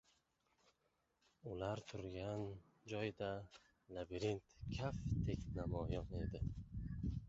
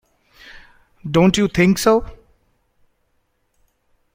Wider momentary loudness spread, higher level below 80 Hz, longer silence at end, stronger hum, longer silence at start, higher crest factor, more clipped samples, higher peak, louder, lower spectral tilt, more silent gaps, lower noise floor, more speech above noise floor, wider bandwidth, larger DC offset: first, 9 LU vs 6 LU; second, -54 dBFS vs -44 dBFS; second, 0 s vs 2 s; neither; first, 1.45 s vs 1.05 s; about the same, 18 dB vs 18 dB; neither; second, -28 dBFS vs -2 dBFS; second, -46 LUFS vs -16 LUFS; about the same, -6.5 dB/octave vs -5.5 dB/octave; neither; first, -84 dBFS vs -66 dBFS; second, 39 dB vs 51 dB; second, 8 kHz vs 16.5 kHz; neither